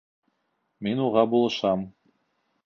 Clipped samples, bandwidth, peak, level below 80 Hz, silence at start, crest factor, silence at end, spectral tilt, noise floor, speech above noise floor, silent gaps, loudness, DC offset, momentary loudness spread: under 0.1%; 7.2 kHz; -6 dBFS; -64 dBFS; 0.8 s; 22 dB; 0.75 s; -6.5 dB/octave; -75 dBFS; 52 dB; none; -24 LUFS; under 0.1%; 11 LU